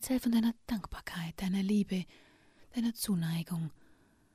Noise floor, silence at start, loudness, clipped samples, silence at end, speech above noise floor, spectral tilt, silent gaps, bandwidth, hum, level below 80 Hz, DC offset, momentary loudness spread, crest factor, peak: -64 dBFS; 0 s; -34 LUFS; under 0.1%; 0.6 s; 31 dB; -5.5 dB/octave; none; 15.5 kHz; none; -56 dBFS; under 0.1%; 11 LU; 14 dB; -20 dBFS